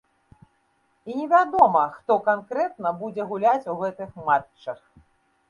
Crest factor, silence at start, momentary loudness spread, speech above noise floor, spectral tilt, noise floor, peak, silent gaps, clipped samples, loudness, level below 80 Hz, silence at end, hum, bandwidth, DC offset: 22 dB; 1.05 s; 18 LU; 45 dB; -7 dB/octave; -67 dBFS; -2 dBFS; none; under 0.1%; -23 LUFS; -64 dBFS; 0.75 s; none; 7.2 kHz; under 0.1%